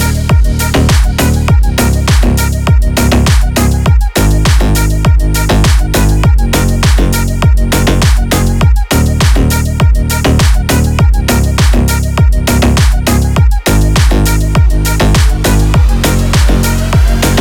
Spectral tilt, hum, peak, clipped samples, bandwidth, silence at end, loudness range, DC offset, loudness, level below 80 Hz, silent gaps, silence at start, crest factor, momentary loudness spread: -5 dB/octave; none; 0 dBFS; under 0.1%; 19 kHz; 0 s; 0 LU; under 0.1%; -10 LUFS; -10 dBFS; none; 0 s; 8 dB; 2 LU